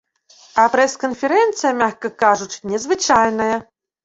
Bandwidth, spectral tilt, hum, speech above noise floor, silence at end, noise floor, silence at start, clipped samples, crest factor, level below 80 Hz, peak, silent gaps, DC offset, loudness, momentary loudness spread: 8 kHz; -3 dB/octave; none; 33 dB; 0.45 s; -50 dBFS; 0.55 s; under 0.1%; 16 dB; -56 dBFS; -2 dBFS; none; under 0.1%; -17 LUFS; 8 LU